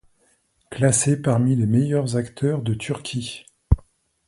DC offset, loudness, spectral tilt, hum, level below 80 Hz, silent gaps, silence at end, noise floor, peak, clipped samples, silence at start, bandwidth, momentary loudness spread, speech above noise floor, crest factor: under 0.1%; -22 LUFS; -5.5 dB/octave; none; -36 dBFS; none; 0.5 s; -64 dBFS; -2 dBFS; under 0.1%; 0.7 s; 11.5 kHz; 11 LU; 43 dB; 20 dB